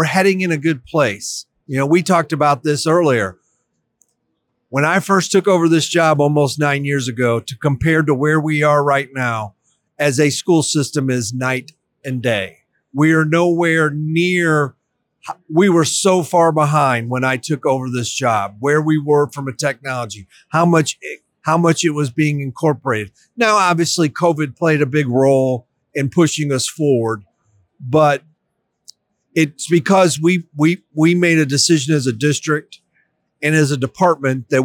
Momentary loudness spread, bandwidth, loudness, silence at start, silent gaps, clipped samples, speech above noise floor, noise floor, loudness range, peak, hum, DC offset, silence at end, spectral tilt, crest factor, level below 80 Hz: 9 LU; 18.5 kHz; -16 LUFS; 0 s; none; under 0.1%; 56 dB; -71 dBFS; 3 LU; -4 dBFS; none; under 0.1%; 0 s; -5 dB/octave; 14 dB; -56 dBFS